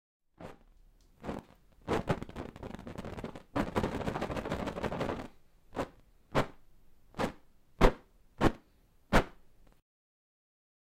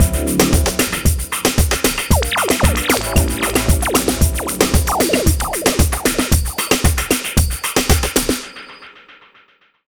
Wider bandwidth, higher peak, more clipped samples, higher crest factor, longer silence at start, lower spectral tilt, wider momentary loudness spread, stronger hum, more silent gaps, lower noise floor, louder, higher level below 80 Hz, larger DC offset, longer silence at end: second, 15.5 kHz vs over 20 kHz; second, -8 dBFS vs 0 dBFS; neither; first, 28 dB vs 16 dB; first, 0.4 s vs 0 s; first, -6 dB/octave vs -4 dB/octave; first, 19 LU vs 3 LU; neither; neither; first, -65 dBFS vs -53 dBFS; second, -35 LUFS vs -16 LUFS; second, -42 dBFS vs -22 dBFS; second, under 0.1% vs 0.3%; first, 1.6 s vs 0.9 s